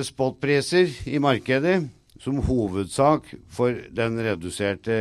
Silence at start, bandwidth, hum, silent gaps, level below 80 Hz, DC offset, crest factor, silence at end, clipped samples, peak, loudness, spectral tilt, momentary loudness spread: 0 s; 13.5 kHz; none; none; -44 dBFS; under 0.1%; 18 dB; 0 s; under 0.1%; -6 dBFS; -23 LUFS; -6 dB/octave; 7 LU